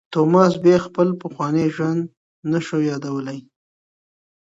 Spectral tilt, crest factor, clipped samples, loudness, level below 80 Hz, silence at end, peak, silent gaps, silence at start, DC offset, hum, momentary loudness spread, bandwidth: -7.5 dB/octave; 20 dB; under 0.1%; -19 LUFS; -62 dBFS; 1.1 s; 0 dBFS; 2.17-2.43 s; 0.1 s; under 0.1%; none; 16 LU; 8 kHz